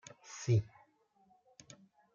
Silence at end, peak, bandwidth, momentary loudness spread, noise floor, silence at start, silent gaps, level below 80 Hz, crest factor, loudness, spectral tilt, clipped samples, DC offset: 1.5 s; -22 dBFS; 7.6 kHz; 25 LU; -71 dBFS; 0.3 s; none; -70 dBFS; 18 dB; -35 LUFS; -6.5 dB/octave; under 0.1%; under 0.1%